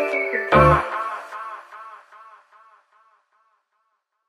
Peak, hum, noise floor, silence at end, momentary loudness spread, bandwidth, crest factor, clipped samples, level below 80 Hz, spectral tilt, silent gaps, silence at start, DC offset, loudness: -2 dBFS; none; -73 dBFS; 2.05 s; 26 LU; 12 kHz; 22 dB; under 0.1%; -40 dBFS; -7 dB/octave; none; 0 s; under 0.1%; -19 LUFS